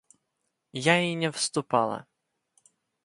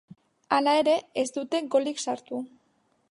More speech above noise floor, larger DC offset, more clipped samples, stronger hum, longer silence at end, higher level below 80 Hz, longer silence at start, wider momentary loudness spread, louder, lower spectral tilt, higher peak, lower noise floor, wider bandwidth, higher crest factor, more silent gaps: first, 53 dB vs 43 dB; neither; neither; neither; first, 1 s vs 0.65 s; about the same, -74 dBFS vs -78 dBFS; first, 0.75 s vs 0.5 s; about the same, 12 LU vs 14 LU; about the same, -26 LUFS vs -26 LUFS; about the same, -4 dB/octave vs -3 dB/octave; about the same, -6 dBFS vs -8 dBFS; first, -80 dBFS vs -69 dBFS; about the same, 11.5 kHz vs 11.5 kHz; about the same, 24 dB vs 20 dB; neither